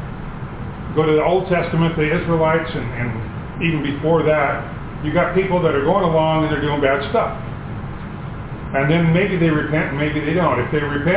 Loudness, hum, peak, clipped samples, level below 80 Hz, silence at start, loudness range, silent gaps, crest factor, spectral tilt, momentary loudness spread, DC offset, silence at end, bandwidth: -18 LUFS; none; -2 dBFS; under 0.1%; -36 dBFS; 0 s; 2 LU; none; 16 dB; -11 dB/octave; 14 LU; under 0.1%; 0 s; 4 kHz